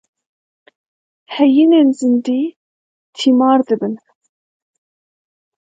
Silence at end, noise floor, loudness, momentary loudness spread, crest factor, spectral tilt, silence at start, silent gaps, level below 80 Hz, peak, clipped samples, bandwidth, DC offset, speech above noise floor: 1.8 s; under -90 dBFS; -14 LUFS; 14 LU; 16 dB; -5.5 dB/octave; 1.3 s; 2.56-3.13 s; -72 dBFS; 0 dBFS; under 0.1%; 9 kHz; under 0.1%; over 77 dB